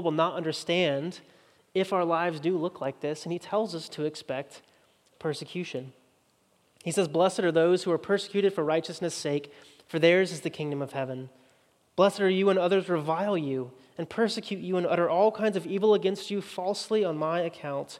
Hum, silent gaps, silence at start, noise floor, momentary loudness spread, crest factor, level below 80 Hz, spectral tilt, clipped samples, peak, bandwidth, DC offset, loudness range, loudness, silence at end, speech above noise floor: none; none; 0 s; -67 dBFS; 12 LU; 20 dB; -80 dBFS; -5.5 dB/octave; under 0.1%; -8 dBFS; 13 kHz; under 0.1%; 7 LU; -28 LUFS; 0 s; 40 dB